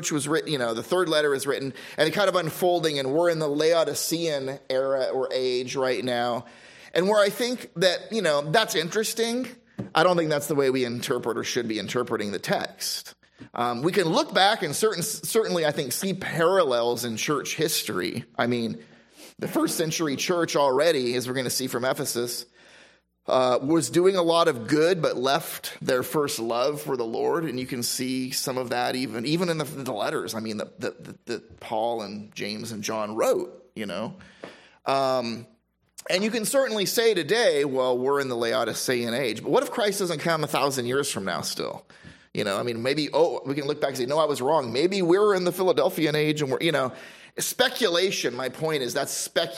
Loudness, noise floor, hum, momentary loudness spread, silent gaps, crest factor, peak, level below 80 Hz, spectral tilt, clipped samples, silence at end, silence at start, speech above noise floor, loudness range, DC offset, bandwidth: -25 LUFS; -56 dBFS; none; 10 LU; none; 20 dB; -6 dBFS; -70 dBFS; -3.5 dB/octave; under 0.1%; 0 s; 0 s; 31 dB; 5 LU; under 0.1%; 16 kHz